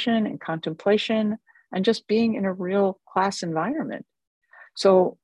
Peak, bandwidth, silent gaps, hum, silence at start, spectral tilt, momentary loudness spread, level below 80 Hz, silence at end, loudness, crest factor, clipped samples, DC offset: -6 dBFS; 11 kHz; 4.27-4.41 s; none; 0 s; -5.5 dB/octave; 12 LU; -68 dBFS; 0.1 s; -24 LUFS; 18 dB; under 0.1%; under 0.1%